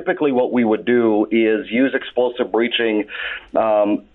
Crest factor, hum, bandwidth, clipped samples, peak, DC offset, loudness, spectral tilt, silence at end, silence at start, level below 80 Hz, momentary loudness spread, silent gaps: 12 dB; none; 4.1 kHz; under 0.1%; -6 dBFS; under 0.1%; -18 LUFS; -9 dB/octave; 0.15 s; 0 s; -58 dBFS; 5 LU; none